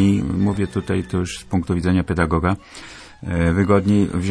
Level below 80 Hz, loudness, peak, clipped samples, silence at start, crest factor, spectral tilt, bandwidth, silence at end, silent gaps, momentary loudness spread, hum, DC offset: -36 dBFS; -20 LUFS; -2 dBFS; under 0.1%; 0 s; 16 dB; -7 dB/octave; 11 kHz; 0 s; none; 12 LU; none; under 0.1%